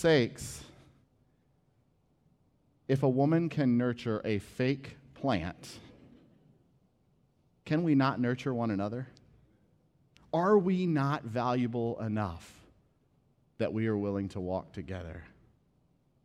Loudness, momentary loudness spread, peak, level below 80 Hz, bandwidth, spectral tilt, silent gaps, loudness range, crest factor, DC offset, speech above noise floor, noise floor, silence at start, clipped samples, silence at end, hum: -31 LUFS; 17 LU; -14 dBFS; -62 dBFS; 14 kHz; -7 dB/octave; none; 6 LU; 20 dB; under 0.1%; 40 dB; -71 dBFS; 0 s; under 0.1%; 1 s; none